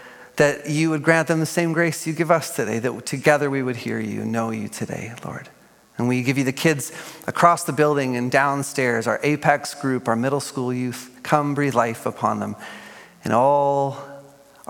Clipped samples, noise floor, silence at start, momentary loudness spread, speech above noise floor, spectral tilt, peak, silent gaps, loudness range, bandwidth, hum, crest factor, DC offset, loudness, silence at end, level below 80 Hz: under 0.1%; -46 dBFS; 0 s; 14 LU; 25 dB; -5.5 dB/octave; 0 dBFS; none; 4 LU; 17.5 kHz; none; 22 dB; under 0.1%; -21 LUFS; 0.45 s; -66 dBFS